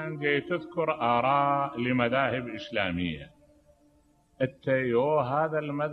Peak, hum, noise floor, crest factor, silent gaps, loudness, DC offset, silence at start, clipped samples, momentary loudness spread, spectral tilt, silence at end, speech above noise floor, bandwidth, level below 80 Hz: -8 dBFS; none; -64 dBFS; 20 dB; none; -28 LUFS; under 0.1%; 0 s; under 0.1%; 8 LU; -8 dB/octave; 0 s; 37 dB; 6.2 kHz; -60 dBFS